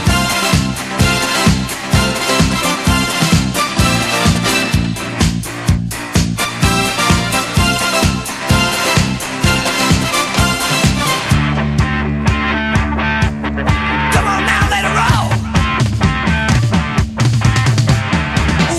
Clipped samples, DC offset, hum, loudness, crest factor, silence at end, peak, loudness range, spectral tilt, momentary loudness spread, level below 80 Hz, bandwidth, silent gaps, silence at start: under 0.1%; under 0.1%; none; -14 LUFS; 14 dB; 0 s; 0 dBFS; 1 LU; -4.5 dB/octave; 4 LU; -24 dBFS; 15.5 kHz; none; 0 s